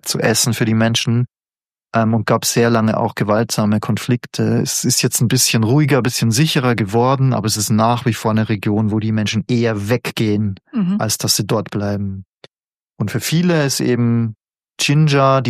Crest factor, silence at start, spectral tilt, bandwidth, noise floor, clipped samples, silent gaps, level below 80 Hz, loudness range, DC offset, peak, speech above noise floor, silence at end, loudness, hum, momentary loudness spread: 16 dB; 0.05 s; -4.5 dB/octave; 15.5 kHz; under -90 dBFS; under 0.1%; 12.28-12.41 s, 12.64-12.68 s, 12.84-12.88 s; -54 dBFS; 4 LU; under 0.1%; 0 dBFS; over 74 dB; 0 s; -16 LUFS; none; 7 LU